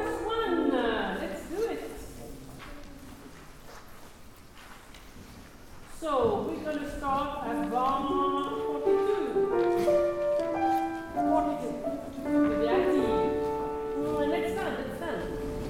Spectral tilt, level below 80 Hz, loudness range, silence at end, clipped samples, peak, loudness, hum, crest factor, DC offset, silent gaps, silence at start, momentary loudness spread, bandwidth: -6 dB/octave; -50 dBFS; 18 LU; 0 s; under 0.1%; -14 dBFS; -29 LUFS; none; 16 dB; under 0.1%; none; 0 s; 23 LU; 16.5 kHz